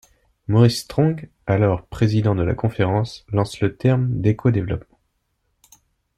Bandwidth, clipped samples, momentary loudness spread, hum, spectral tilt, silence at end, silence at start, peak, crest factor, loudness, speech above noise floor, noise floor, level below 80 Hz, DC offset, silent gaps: 13.5 kHz; under 0.1%; 7 LU; none; -7.5 dB/octave; 1.4 s; 0.5 s; -4 dBFS; 16 dB; -20 LUFS; 51 dB; -70 dBFS; -46 dBFS; under 0.1%; none